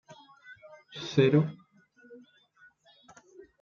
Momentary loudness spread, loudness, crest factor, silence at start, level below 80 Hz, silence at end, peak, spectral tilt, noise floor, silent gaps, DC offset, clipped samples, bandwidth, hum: 28 LU; -27 LUFS; 22 dB; 0.1 s; -76 dBFS; 1.45 s; -10 dBFS; -7.5 dB/octave; -62 dBFS; none; under 0.1%; under 0.1%; 7.2 kHz; none